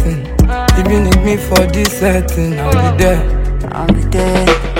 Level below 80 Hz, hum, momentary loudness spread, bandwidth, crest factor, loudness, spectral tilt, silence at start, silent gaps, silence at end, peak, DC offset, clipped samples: -16 dBFS; none; 5 LU; 17 kHz; 12 dB; -13 LUFS; -5.5 dB/octave; 0 s; none; 0 s; 0 dBFS; under 0.1%; 0.1%